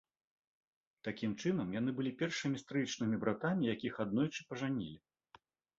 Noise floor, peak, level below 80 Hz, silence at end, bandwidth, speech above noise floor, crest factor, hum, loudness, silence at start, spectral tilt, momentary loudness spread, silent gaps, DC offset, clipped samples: -67 dBFS; -18 dBFS; -72 dBFS; 0.8 s; 7.6 kHz; 30 dB; 20 dB; none; -38 LUFS; 1.05 s; -5.5 dB/octave; 5 LU; none; under 0.1%; under 0.1%